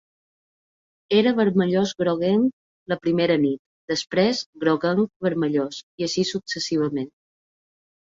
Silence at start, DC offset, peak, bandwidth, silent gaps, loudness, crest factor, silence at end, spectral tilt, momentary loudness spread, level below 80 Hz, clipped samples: 1.1 s; under 0.1%; -6 dBFS; 7.8 kHz; 2.53-2.86 s, 3.59-3.88 s, 4.46-4.53 s, 5.16-5.20 s, 5.83-5.98 s; -23 LUFS; 18 dB; 1 s; -5.5 dB/octave; 8 LU; -64 dBFS; under 0.1%